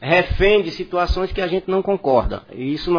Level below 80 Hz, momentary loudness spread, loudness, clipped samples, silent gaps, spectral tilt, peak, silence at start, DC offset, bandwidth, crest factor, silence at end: -30 dBFS; 9 LU; -19 LUFS; under 0.1%; none; -7 dB/octave; -4 dBFS; 0 s; 0.2%; 5.4 kHz; 16 dB; 0 s